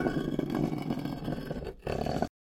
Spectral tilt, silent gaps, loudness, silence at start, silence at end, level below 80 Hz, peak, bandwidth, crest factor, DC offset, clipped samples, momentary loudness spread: -7.5 dB/octave; none; -34 LUFS; 0 s; 0.25 s; -48 dBFS; -12 dBFS; 17 kHz; 20 dB; under 0.1%; under 0.1%; 5 LU